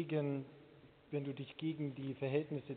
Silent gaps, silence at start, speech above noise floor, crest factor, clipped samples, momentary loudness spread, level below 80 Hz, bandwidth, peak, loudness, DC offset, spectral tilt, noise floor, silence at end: none; 0 s; 22 dB; 20 dB; under 0.1%; 7 LU; -80 dBFS; 4.5 kHz; -22 dBFS; -41 LUFS; under 0.1%; -7 dB/octave; -62 dBFS; 0 s